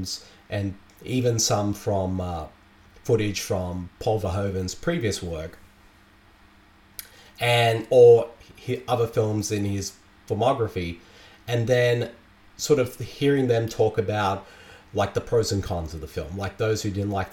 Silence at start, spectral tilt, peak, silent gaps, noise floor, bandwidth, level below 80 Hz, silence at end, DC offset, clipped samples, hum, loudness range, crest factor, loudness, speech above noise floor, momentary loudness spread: 0 s; -5 dB/octave; -4 dBFS; none; -54 dBFS; 17 kHz; -48 dBFS; 0 s; under 0.1%; under 0.1%; none; 7 LU; 20 dB; -24 LUFS; 31 dB; 14 LU